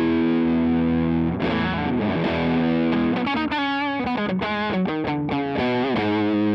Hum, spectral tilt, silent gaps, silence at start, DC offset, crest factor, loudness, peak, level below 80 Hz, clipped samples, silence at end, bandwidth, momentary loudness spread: none; -8.5 dB/octave; none; 0 s; under 0.1%; 10 dB; -22 LUFS; -12 dBFS; -48 dBFS; under 0.1%; 0 s; 6 kHz; 4 LU